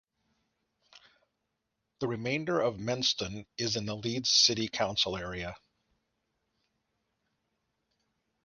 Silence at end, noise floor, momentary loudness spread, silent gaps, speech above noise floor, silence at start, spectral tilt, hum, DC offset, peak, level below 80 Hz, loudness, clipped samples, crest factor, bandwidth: 2.85 s; -83 dBFS; 15 LU; none; 52 dB; 0.95 s; -3 dB/octave; none; under 0.1%; -8 dBFS; -62 dBFS; -29 LUFS; under 0.1%; 26 dB; 10.5 kHz